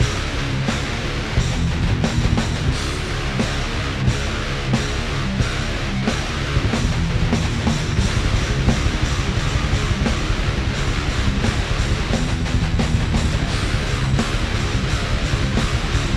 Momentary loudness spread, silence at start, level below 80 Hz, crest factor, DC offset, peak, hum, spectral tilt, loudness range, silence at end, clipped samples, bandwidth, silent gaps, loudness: 3 LU; 0 s; -24 dBFS; 16 dB; under 0.1%; -4 dBFS; none; -5 dB/octave; 2 LU; 0 s; under 0.1%; 13 kHz; none; -21 LUFS